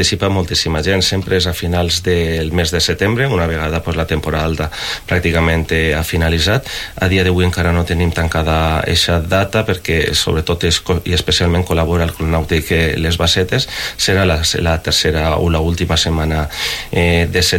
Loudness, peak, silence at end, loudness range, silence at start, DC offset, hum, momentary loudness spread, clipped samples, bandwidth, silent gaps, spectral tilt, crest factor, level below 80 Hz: -15 LUFS; -2 dBFS; 0 s; 2 LU; 0 s; under 0.1%; none; 5 LU; under 0.1%; 17 kHz; none; -4.5 dB/octave; 12 dB; -26 dBFS